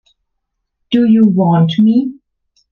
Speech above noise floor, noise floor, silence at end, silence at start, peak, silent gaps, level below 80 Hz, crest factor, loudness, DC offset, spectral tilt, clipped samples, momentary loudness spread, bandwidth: 62 dB; -72 dBFS; 0.6 s; 0.9 s; -2 dBFS; none; -58 dBFS; 12 dB; -12 LUFS; under 0.1%; -9.5 dB/octave; under 0.1%; 7 LU; 4.5 kHz